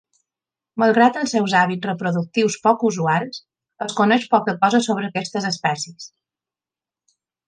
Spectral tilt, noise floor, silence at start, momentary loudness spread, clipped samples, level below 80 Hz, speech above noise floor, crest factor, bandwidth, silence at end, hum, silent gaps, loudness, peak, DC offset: -5 dB/octave; under -90 dBFS; 0.75 s; 15 LU; under 0.1%; -70 dBFS; over 71 dB; 18 dB; 9.8 kHz; 1.4 s; none; none; -19 LUFS; -2 dBFS; under 0.1%